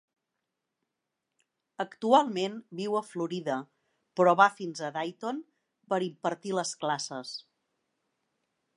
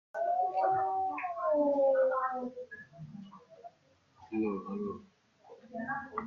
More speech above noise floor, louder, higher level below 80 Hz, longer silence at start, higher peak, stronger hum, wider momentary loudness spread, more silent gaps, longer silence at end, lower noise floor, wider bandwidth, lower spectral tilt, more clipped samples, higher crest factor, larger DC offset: first, 56 dB vs 35 dB; first, -29 LUFS vs -32 LUFS; second, -86 dBFS vs -76 dBFS; first, 1.8 s vs 0.15 s; first, -6 dBFS vs -18 dBFS; neither; second, 14 LU vs 21 LU; neither; first, 1.35 s vs 0 s; first, -85 dBFS vs -67 dBFS; first, 11.5 kHz vs 6.6 kHz; second, -4.5 dB/octave vs -8.5 dB/octave; neither; first, 24 dB vs 16 dB; neither